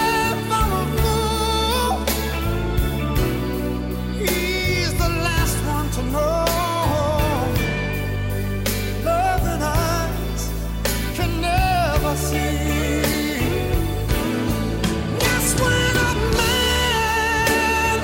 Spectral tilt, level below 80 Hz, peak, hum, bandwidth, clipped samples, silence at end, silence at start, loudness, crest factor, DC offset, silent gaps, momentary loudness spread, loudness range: -4.5 dB/octave; -28 dBFS; -6 dBFS; none; 17 kHz; under 0.1%; 0 s; 0 s; -21 LUFS; 14 dB; under 0.1%; none; 6 LU; 3 LU